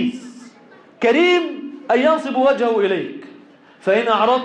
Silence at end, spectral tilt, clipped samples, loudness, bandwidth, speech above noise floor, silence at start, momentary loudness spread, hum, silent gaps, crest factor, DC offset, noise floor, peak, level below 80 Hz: 0 s; -5 dB/octave; under 0.1%; -17 LUFS; 9.6 kHz; 30 dB; 0 s; 17 LU; none; none; 14 dB; under 0.1%; -46 dBFS; -6 dBFS; -66 dBFS